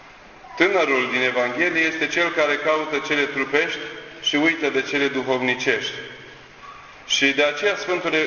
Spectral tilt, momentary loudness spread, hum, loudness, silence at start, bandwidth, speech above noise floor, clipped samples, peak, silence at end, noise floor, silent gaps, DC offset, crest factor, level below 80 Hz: -3 dB/octave; 16 LU; none; -20 LUFS; 0 s; 7.2 kHz; 23 dB; under 0.1%; -4 dBFS; 0 s; -44 dBFS; none; under 0.1%; 20 dB; -60 dBFS